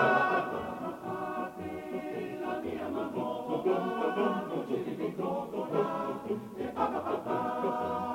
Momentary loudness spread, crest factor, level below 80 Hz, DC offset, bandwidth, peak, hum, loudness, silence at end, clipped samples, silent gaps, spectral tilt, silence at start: 8 LU; 18 dB; -66 dBFS; under 0.1%; 16.5 kHz; -14 dBFS; none; -33 LUFS; 0 s; under 0.1%; none; -6.5 dB/octave; 0 s